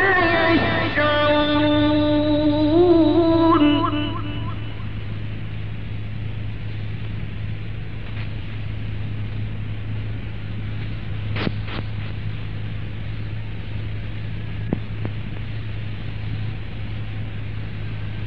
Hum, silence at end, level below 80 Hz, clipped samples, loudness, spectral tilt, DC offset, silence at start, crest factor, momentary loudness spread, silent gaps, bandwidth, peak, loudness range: none; 0 s; -36 dBFS; under 0.1%; -23 LUFS; -9 dB/octave; 3%; 0 s; 16 dB; 14 LU; none; 5.6 kHz; -6 dBFS; 13 LU